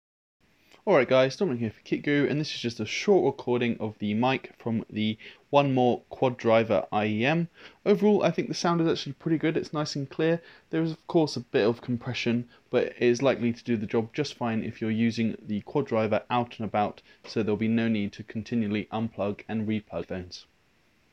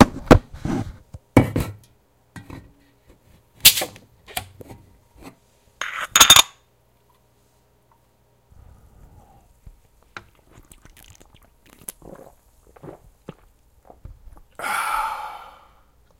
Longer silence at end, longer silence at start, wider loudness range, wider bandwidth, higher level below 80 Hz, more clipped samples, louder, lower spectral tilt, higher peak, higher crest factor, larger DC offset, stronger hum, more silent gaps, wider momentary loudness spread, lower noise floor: about the same, 0.7 s vs 0.8 s; first, 0.85 s vs 0 s; second, 4 LU vs 13 LU; second, 8.4 kHz vs 17 kHz; second, -68 dBFS vs -38 dBFS; neither; second, -27 LUFS vs -17 LUFS; first, -6.5 dB/octave vs -2.5 dB/octave; second, -6 dBFS vs 0 dBFS; about the same, 22 dB vs 24 dB; neither; neither; neither; second, 9 LU vs 30 LU; first, -66 dBFS vs -61 dBFS